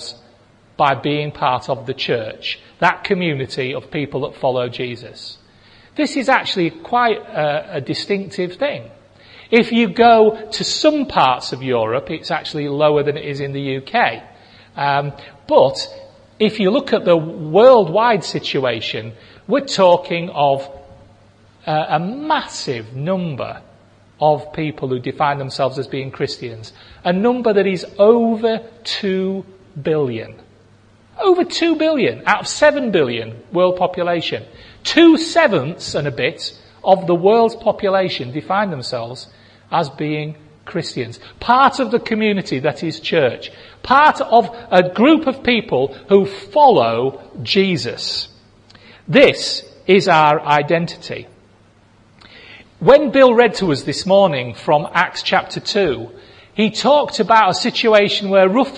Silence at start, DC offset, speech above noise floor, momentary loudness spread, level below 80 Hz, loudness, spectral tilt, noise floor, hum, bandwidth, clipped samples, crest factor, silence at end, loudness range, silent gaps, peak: 0 s; under 0.1%; 34 dB; 14 LU; -54 dBFS; -16 LUFS; -5 dB/octave; -50 dBFS; none; 10.5 kHz; under 0.1%; 16 dB; 0 s; 6 LU; none; 0 dBFS